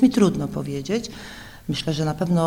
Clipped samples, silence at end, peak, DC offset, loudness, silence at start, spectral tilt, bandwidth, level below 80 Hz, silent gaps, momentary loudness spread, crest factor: under 0.1%; 0 s; -4 dBFS; under 0.1%; -24 LUFS; 0 s; -6.5 dB/octave; 16 kHz; -48 dBFS; none; 16 LU; 18 dB